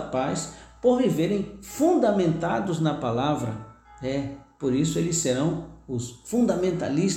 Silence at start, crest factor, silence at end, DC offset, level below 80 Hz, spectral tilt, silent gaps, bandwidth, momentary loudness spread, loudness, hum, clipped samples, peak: 0 s; 16 dB; 0 s; under 0.1%; -52 dBFS; -5.5 dB/octave; none; 17 kHz; 12 LU; -25 LUFS; none; under 0.1%; -10 dBFS